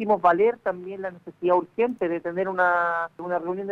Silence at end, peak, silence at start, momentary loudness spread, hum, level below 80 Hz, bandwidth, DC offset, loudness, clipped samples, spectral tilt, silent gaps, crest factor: 0 s; -8 dBFS; 0 s; 12 LU; none; -68 dBFS; 6.8 kHz; under 0.1%; -24 LUFS; under 0.1%; -8 dB/octave; none; 18 dB